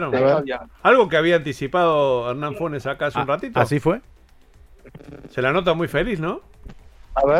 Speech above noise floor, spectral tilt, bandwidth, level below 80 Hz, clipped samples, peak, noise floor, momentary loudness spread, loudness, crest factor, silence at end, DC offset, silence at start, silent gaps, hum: 29 dB; -6.5 dB/octave; 14 kHz; -44 dBFS; under 0.1%; -2 dBFS; -50 dBFS; 12 LU; -20 LUFS; 18 dB; 0 s; under 0.1%; 0 s; none; none